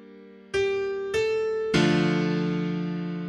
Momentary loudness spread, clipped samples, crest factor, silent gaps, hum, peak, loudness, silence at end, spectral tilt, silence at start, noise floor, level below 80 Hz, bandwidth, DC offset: 7 LU; under 0.1%; 16 dB; none; none; -8 dBFS; -26 LUFS; 0 s; -6 dB/octave; 0 s; -47 dBFS; -54 dBFS; 10.5 kHz; under 0.1%